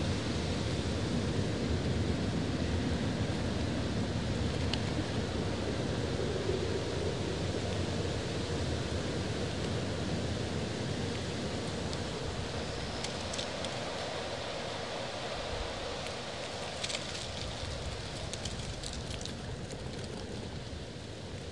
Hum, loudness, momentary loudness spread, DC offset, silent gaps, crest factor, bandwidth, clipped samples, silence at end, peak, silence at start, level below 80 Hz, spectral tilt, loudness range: none; -36 LUFS; 6 LU; 0.3%; none; 18 dB; 11.5 kHz; under 0.1%; 0 s; -18 dBFS; 0 s; -48 dBFS; -5 dB/octave; 5 LU